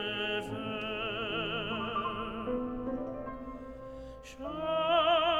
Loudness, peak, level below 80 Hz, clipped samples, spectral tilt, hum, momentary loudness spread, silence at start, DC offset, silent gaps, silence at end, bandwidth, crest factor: -33 LUFS; -16 dBFS; -54 dBFS; under 0.1%; -5.5 dB/octave; none; 17 LU; 0 s; under 0.1%; none; 0 s; 12 kHz; 16 dB